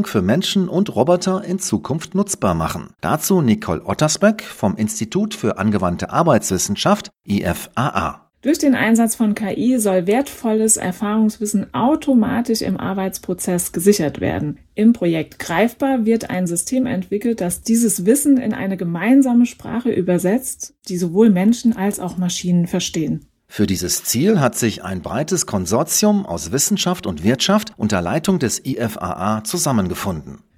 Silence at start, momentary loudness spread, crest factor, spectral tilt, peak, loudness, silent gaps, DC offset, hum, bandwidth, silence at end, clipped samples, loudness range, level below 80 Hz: 0 s; 8 LU; 18 dB; -5 dB/octave; 0 dBFS; -18 LUFS; none; under 0.1%; none; 16.5 kHz; 0.2 s; under 0.1%; 2 LU; -46 dBFS